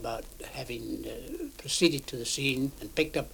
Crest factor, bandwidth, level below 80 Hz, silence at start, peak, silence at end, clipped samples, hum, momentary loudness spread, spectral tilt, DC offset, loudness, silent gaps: 22 dB; 19.5 kHz; -50 dBFS; 0 s; -10 dBFS; 0 s; under 0.1%; none; 14 LU; -3.5 dB/octave; under 0.1%; -31 LUFS; none